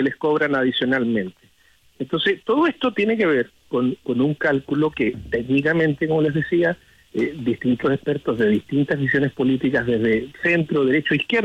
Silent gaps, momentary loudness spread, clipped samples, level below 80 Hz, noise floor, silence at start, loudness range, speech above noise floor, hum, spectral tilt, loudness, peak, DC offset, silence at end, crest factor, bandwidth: none; 5 LU; under 0.1%; -54 dBFS; -57 dBFS; 0 s; 1 LU; 36 dB; none; -7.5 dB/octave; -21 LUFS; -8 dBFS; under 0.1%; 0 s; 12 dB; 8.8 kHz